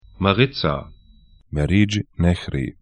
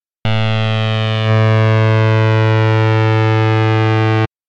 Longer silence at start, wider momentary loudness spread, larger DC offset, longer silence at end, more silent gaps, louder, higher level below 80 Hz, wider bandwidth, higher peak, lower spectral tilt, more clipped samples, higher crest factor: about the same, 0.2 s vs 0.25 s; first, 9 LU vs 4 LU; neither; about the same, 0.1 s vs 0.2 s; neither; second, -21 LUFS vs -13 LUFS; first, -36 dBFS vs -48 dBFS; first, 10 kHz vs 6.6 kHz; first, 0 dBFS vs -4 dBFS; about the same, -6.5 dB/octave vs -7.5 dB/octave; neither; first, 20 dB vs 10 dB